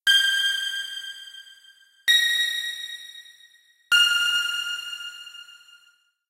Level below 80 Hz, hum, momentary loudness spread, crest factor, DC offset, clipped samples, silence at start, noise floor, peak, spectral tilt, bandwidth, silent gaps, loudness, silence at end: -74 dBFS; none; 23 LU; 18 dB; under 0.1%; under 0.1%; 0.05 s; -62 dBFS; -8 dBFS; 4.5 dB/octave; 16 kHz; none; -21 LUFS; 0.8 s